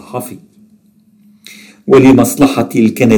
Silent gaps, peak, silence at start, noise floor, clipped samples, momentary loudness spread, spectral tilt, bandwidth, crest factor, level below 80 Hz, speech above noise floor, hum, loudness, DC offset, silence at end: none; 0 dBFS; 0.15 s; -49 dBFS; under 0.1%; 20 LU; -6 dB/octave; 18 kHz; 12 dB; -42 dBFS; 40 dB; none; -9 LUFS; under 0.1%; 0 s